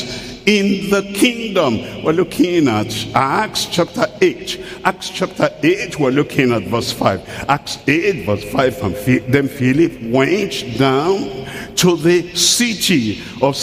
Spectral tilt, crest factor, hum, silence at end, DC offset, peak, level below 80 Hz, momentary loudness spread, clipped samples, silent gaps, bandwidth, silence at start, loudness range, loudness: -4.5 dB/octave; 16 dB; none; 0 s; under 0.1%; 0 dBFS; -46 dBFS; 7 LU; under 0.1%; none; 15.5 kHz; 0 s; 2 LU; -16 LUFS